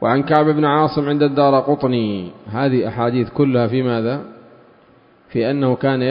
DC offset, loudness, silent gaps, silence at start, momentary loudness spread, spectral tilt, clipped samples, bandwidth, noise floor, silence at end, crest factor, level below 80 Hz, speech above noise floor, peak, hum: under 0.1%; -17 LUFS; none; 0 s; 9 LU; -10.5 dB/octave; under 0.1%; 5.4 kHz; -50 dBFS; 0 s; 18 dB; -54 dBFS; 34 dB; 0 dBFS; none